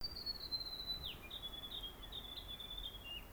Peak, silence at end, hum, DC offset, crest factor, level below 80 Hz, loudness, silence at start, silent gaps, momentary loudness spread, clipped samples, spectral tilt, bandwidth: -32 dBFS; 0 s; none; under 0.1%; 16 dB; -56 dBFS; -45 LUFS; 0 s; none; 6 LU; under 0.1%; -3 dB/octave; over 20 kHz